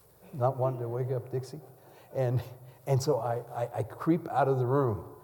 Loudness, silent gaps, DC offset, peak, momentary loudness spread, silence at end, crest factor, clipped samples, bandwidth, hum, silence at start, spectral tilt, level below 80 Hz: -31 LUFS; none; under 0.1%; -14 dBFS; 14 LU; 0 s; 16 dB; under 0.1%; 19 kHz; none; 0.25 s; -7.5 dB/octave; -66 dBFS